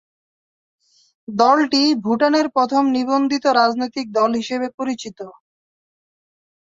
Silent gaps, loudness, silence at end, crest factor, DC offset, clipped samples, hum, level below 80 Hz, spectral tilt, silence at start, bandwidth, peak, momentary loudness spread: 4.74-4.78 s; -18 LUFS; 1.35 s; 18 dB; under 0.1%; under 0.1%; none; -64 dBFS; -4 dB/octave; 1.3 s; 7.8 kHz; -2 dBFS; 13 LU